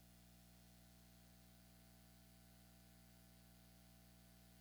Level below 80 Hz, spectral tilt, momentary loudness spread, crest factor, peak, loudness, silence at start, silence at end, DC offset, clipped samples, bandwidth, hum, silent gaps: -72 dBFS; -4 dB/octave; 0 LU; 12 dB; -54 dBFS; -67 LUFS; 0 s; 0 s; under 0.1%; under 0.1%; over 20 kHz; 60 Hz at -70 dBFS; none